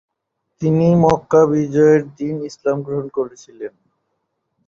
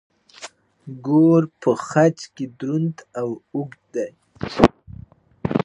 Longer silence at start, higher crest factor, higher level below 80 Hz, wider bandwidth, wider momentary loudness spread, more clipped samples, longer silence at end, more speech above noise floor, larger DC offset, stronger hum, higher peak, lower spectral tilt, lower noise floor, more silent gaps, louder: first, 0.6 s vs 0.4 s; second, 16 dB vs 22 dB; second, -52 dBFS vs -46 dBFS; second, 7.4 kHz vs 10 kHz; about the same, 18 LU vs 19 LU; neither; first, 1 s vs 0 s; first, 59 dB vs 24 dB; neither; neither; about the same, -2 dBFS vs 0 dBFS; first, -8.5 dB/octave vs -7 dB/octave; first, -75 dBFS vs -44 dBFS; neither; first, -17 LUFS vs -21 LUFS